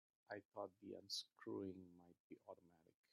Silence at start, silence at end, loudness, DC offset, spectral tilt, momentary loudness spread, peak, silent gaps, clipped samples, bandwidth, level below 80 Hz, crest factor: 0.3 s; 0.3 s; -54 LUFS; under 0.1%; -3.5 dB/octave; 15 LU; -36 dBFS; 0.45-0.52 s, 2.20-2.30 s; under 0.1%; 11 kHz; under -90 dBFS; 20 dB